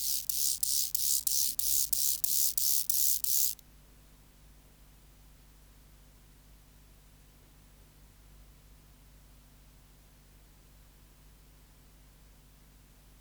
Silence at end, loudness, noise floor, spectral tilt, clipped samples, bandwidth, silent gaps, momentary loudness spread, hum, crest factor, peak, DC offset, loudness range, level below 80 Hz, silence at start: 4.75 s; -26 LUFS; -58 dBFS; 1.5 dB/octave; under 0.1%; over 20 kHz; none; 3 LU; 50 Hz at -60 dBFS; 24 dB; -12 dBFS; under 0.1%; 8 LU; -60 dBFS; 0 s